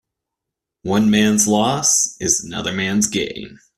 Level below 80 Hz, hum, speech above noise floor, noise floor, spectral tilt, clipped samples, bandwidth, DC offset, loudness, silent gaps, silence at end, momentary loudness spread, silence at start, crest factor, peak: -50 dBFS; none; 65 dB; -83 dBFS; -3 dB/octave; under 0.1%; 14 kHz; under 0.1%; -17 LUFS; none; 0.2 s; 10 LU; 0.85 s; 18 dB; -2 dBFS